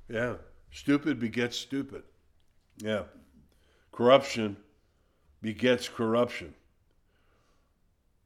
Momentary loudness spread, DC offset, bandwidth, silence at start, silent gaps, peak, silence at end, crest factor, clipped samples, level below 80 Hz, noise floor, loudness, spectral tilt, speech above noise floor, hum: 25 LU; under 0.1%; 15 kHz; 0.1 s; none; -8 dBFS; 1.75 s; 22 dB; under 0.1%; -62 dBFS; -69 dBFS; -29 LUFS; -5 dB/octave; 41 dB; none